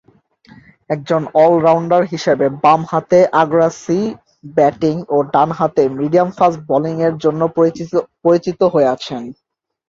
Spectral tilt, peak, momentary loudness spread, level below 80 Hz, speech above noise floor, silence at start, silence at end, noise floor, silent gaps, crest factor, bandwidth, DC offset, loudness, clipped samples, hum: -7 dB/octave; -2 dBFS; 9 LU; -56 dBFS; 34 dB; 0.9 s; 0.55 s; -48 dBFS; none; 14 dB; 7.6 kHz; under 0.1%; -15 LUFS; under 0.1%; none